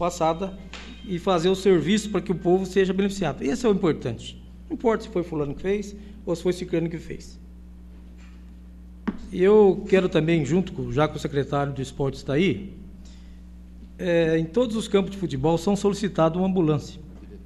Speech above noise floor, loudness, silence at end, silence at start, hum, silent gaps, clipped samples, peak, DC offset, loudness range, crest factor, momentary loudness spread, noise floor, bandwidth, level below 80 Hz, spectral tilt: 20 dB; -24 LUFS; 0 s; 0 s; none; none; under 0.1%; -8 dBFS; under 0.1%; 7 LU; 18 dB; 17 LU; -43 dBFS; 12.5 kHz; -44 dBFS; -6.5 dB/octave